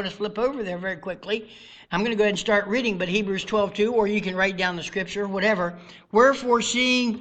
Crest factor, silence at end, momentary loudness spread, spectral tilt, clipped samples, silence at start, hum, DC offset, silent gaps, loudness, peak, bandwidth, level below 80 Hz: 18 dB; 0 s; 10 LU; -4 dB/octave; under 0.1%; 0 s; none; under 0.1%; none; -23 LUFS; -6 dBFS; 9 kHz; -54 dBFS